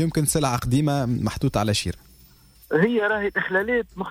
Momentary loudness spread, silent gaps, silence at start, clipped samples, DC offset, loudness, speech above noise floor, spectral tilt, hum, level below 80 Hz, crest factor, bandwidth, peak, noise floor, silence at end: 5 LU; none; 0 s; under 0.1%; under 0.1%; -23 LUFS; 30 dB; -5 dB/octave; none; -44 dBFS; 16 dB; 16.5 kHz; -8 dBFS; -52 dBFS; 0 s